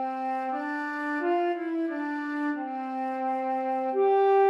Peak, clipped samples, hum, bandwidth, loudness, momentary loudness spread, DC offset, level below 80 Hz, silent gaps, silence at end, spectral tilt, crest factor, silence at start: -14 dBFS; under 0.1%; none; 6.8 kHz; -29 LUFS; 7 LU; under 0.1%; under -90 dBFS; none; 0 s; -5 dB/octave; 14 dB; 0 s